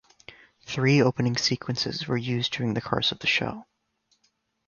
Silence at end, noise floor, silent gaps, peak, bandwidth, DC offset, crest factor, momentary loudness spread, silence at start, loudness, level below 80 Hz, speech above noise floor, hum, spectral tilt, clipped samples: 1.05 s; -72 dBFS; none; -6 dBFS; 7.2 kHz; under 0.1%; 20 dB; 8 LU; 0.3 s; -25 LUFS; -58 dBFS; 46 dB; none; -5 dB/octave; under 0.1%